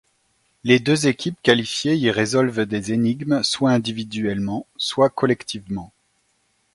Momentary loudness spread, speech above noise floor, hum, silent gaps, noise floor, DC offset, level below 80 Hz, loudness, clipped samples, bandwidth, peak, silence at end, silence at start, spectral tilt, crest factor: 9 LU; 46 dB; none; none; -66 dBFS; under 0.1%; -56 dBFS; -20 LUFS; under 0.1%; 11.5 kHz; 0 dBFS; 0.9 s; 0.65 s; -5 dB/octave; 22 dB